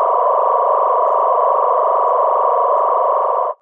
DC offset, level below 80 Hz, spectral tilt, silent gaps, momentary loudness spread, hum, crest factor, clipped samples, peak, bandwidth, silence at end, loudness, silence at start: under 0.1%; under -90 dBFS; -3.5 dB/octave; none; 1 LU; none; 12 dB; under 0.1%; -2 dBFS; 3.7 kHz; 0.05 s; -15 LUFS; 0 s